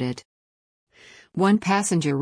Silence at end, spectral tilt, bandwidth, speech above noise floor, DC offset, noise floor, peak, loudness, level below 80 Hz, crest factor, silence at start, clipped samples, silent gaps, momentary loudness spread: 0 s; -5.5 dB/octave; 10.5 kHz; over 68 dB; under 0.1%; under -90 dBFS; -8 dBFS; -22 LUFS; -64 dBFS; 16 dB; 0 s; under 0.1%; 0.25-0.87 s; 15 LU